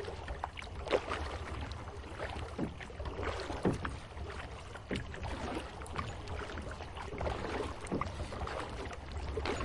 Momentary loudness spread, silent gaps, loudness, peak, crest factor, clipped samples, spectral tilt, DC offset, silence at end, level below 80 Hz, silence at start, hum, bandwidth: 9 LU; none; -40 LUFS; -16 dBFS; 22 dB; under 0.1%; -5.5 dB/octave; under 0.1%; 0 s; -48 dBFS; 0 s; none; 11.5 kHz